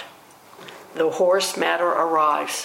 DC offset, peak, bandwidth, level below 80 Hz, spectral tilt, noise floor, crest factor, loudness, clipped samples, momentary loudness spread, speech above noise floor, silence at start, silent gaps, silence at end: under 0.1%; -6 dBFS; 16.5 kHz; -76 dBFS; -2.5 dB/octave; -47 dBFS; 16 dB; -20 LUFS; under 0.1%; 22 LU; 27 dB; 0 s; none; 0 s